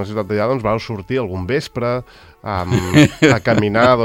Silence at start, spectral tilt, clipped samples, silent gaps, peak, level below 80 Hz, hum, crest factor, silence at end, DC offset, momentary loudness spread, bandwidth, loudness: 0 s; -6 dB/octave; under 0.1%; none; 0 dBFS; -44 dBFS; none; 16 dB; 0 s; under 0.1%; 11 LU; 16.5 kHz; -17 LUFS